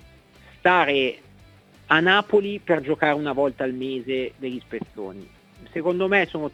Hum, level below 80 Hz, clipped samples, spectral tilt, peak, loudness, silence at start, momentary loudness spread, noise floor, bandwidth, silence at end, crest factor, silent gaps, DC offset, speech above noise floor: none; -58 dBFS; under 0.1%; -6.5 dB/octave; -2 dBFS; -22 LUFS; 0.65 s; 16 LU; -51 dBFS; 8.8 kHz; 0.05 s; 22 dB; none; under 0.1%; 29 dB